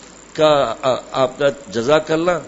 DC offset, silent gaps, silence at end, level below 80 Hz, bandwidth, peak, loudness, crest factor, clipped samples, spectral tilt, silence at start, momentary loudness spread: under 0.1%; none; 0 s; -50 dBFS; 8 kHz; 0 dBFS; -17 LUFS; 18 dB; under 0.1%; -5 dB/octave; 0.35 s; 6 LU